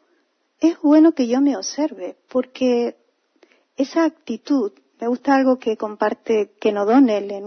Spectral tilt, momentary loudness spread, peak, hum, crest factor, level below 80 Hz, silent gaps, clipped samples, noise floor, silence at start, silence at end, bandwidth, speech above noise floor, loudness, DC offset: -4.5 dB/octave; 10 LU; -4 dBFS; none; 16 dB; -74 dBFS; none; under 0.1%; -65 dBFS; 0.6 s; 0 s; 6.4 kHz; 47 dB; -19 LUFS; under 0.1%